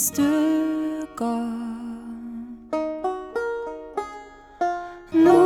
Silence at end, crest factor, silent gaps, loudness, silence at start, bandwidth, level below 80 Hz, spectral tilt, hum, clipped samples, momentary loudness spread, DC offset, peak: 0 s; 18 dB; none; -25 LUFS; 0 s; 19 kHz; -56 dBFS; -4.5 dB/octave; none; under 0.1%; 15 LU; under 0.1%; -6 dBFS